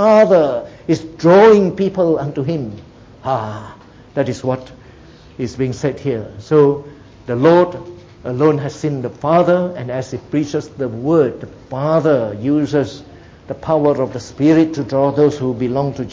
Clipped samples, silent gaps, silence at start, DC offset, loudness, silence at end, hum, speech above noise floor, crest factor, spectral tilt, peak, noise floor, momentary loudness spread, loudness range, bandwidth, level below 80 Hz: under 0.1%; none; 0 s; under 0.1%; -16 LUFS; 0 s; none; 26 dB; 16 dB; -7.5 dB/octave; 0 dBFS; -41 dBFS; 15 LU; 8 LU; 7.8 kHz; -48 dBFS